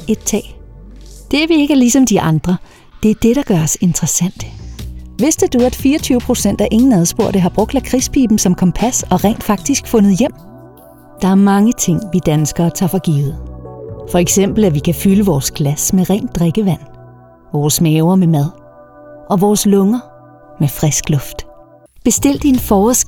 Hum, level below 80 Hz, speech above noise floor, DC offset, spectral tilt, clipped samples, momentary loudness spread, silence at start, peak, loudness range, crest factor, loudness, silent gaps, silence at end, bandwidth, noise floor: none; -34 dBFS; 29 dB; under 0.1%; -5.5 dB/octave; under 0.1%; 10 LU; 0 s; 0 dBFS; 2 LU; 14 dB; -13 LUFS; none; 0 s; 19 kHz; -42 dBFS